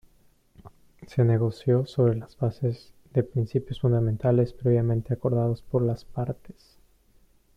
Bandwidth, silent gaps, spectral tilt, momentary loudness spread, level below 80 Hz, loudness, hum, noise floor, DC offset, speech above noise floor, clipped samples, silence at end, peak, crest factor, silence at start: 5.6 kHz; none; -10 dB/octave; 9 LU; -52 dBFS; -26 LUFS; none; -61 dBFS; under 0.1%; 36 dB; under 0.1%; 1.1 s; -10 dBFS; 16 dB; 0.65 s